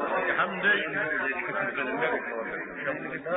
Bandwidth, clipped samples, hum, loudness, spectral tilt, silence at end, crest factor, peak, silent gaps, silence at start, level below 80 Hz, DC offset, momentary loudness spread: 4 kHz; under 0.1%; none; -28 LUFS; -1.5 dB/octave; 0 s; 16 dB; -14 dBFS; none; 0 s; -66 dBFS; under 0.1%; 9 LU